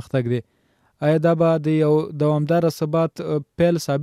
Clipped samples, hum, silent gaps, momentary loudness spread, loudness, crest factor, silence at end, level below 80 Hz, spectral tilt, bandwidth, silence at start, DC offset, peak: under 0.1%; none; none; 7 LU; -20 LUFS; 14 dB; 0 s; -56 dBFS; -7.5 dB/octave; 14.5 kHz; 0.15 s; under 0.1%; -6 dBFS